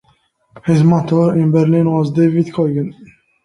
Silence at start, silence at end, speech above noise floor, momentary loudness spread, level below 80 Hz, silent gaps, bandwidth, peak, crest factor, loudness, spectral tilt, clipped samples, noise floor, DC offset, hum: 0.55 s; 0.4 s; 45 dB; 8 LU; -52 dBFS; none; 10 kHz; -2 dBFS; 12 dB; -14 LUFS; -9.5 dB/octave; under 0.1%; -58 dBFS; under 0.1%; none